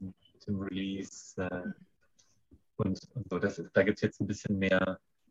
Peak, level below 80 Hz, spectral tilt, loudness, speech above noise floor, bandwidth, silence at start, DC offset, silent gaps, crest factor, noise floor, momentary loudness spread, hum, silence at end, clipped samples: -12 dBFS; -64 dBFS; -6 dB/octave; -33 LUFS; 38 dB; 8 kHz; 0 s; under 0.1%; none; 22 dB; -71 dBFS; 16 LU; none; 0.35 s; under 0.1%